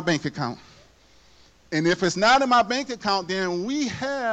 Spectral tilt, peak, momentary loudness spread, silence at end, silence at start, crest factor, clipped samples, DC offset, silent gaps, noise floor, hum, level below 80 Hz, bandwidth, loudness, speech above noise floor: -4 dB/octave; -10 dBFS; 11 LU; 0 s; 0 s; 14 dB; under 0.1%; under 0.1%; none; -55 dBFS; none; -58 dBFS; 9 kHz; -23 LUFS; 33 dB